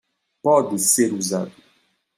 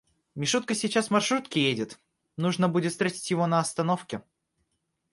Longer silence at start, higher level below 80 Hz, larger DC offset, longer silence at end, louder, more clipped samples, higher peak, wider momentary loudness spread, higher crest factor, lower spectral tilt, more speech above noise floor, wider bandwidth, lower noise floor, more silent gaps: about the same, 0.45 s vs 0.35 s; about the same, -70 dBFS vs -70 dBFS; neither; second, 0.65 s vs 0.9 s; first, -19 LUFS vs -27 LUFS; neither; first, -4 dBFS vs -10 dBFS; second, 10 LU vs 13 LU; about the same, 18 dB vs 18 dB; about the same, -3.5 dB/octave vs -4.5 dB/octave; second, 44 dB vs 51 dB; first, 16 kHz vs 11.5 kHz; second, -64 dBFS vs -78 dBFS; neither